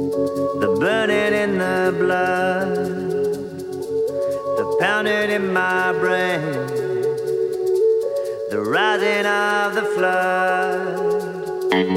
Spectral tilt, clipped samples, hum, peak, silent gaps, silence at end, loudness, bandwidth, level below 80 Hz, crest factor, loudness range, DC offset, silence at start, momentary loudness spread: -5 dB/octave; under 0.1%; none; -4 dBFS; none; 0 s; -20 LUFS; 16 kHz; -62 dBFS; 16 dB; 2 LU; under 0.1%; 0 s; 6 LU